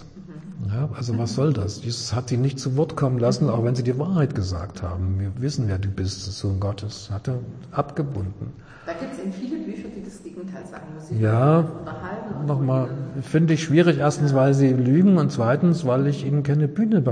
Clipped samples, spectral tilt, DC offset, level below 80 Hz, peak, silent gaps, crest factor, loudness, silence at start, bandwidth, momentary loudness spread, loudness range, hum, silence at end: under 0.1%; -7.5 dB/octave; under 0.1%; -50 dBFS; -6 dBFS; none; 16 dB; -23 LUFS; 0 s; 10 kHz; 17 LU; 11 LU; none; 0 s